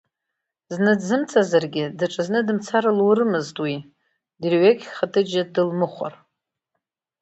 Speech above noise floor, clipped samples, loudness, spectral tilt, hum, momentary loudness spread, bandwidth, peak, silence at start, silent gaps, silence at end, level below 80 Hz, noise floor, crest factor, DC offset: 62 dB; under 0.1%; -21 LUFS; -6 dB/octave; none; 10 LU; 8.2 kHz; -4 dBFS; 0.7 s; none; 1.1 s; -70 dBFS; -82 dBFS; 18 dB; under 0.1%